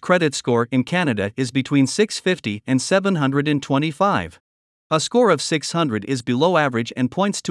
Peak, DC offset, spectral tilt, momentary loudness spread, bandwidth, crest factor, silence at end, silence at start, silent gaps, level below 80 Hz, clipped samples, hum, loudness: -2 dBFS; under 0.1%; -5 dB/octave; 6 LU; 12 kHz; 18 dB; 0 s; 0.05 s; 4.40-4.90 s; -62 dBFS; under 0.1%; none; -20 LUFS